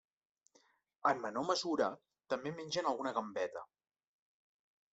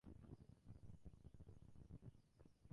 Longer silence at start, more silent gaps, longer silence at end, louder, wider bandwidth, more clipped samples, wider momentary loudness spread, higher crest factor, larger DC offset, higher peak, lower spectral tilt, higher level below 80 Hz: first, 1.05 s vs 0.05 s; neither; first, 1.3 s vs 0 s; first, -37 LUFS vs -65 LUFS; second, 8.2 kHz vs 10.5 kHz; neither; first, 7 LU vs 3 LU; about the same, 22 dB vs 20 dB; neither; first, -18 dBFS vs -42 dBFS; second, -4 dB/octave vs -8.5 dB/octave; second, -82 dBFS vs -68 dBFS